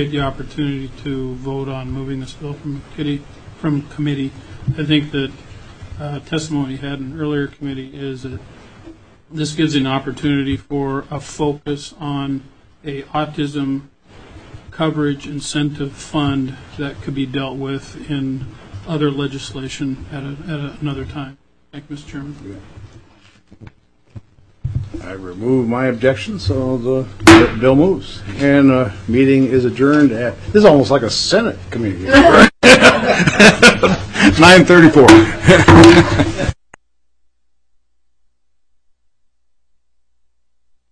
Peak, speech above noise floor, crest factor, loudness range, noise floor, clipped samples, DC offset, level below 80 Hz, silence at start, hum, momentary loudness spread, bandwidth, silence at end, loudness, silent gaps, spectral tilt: 0 dBFS; 53 dB; 14 dB; 17 LU; -67 dBFS; 0.3%; 0.2%; -36 dBFS; 0 s; none; 22 LU; 11 kHz; 4.4 s; -13 LUFS; none; -5 dB/octave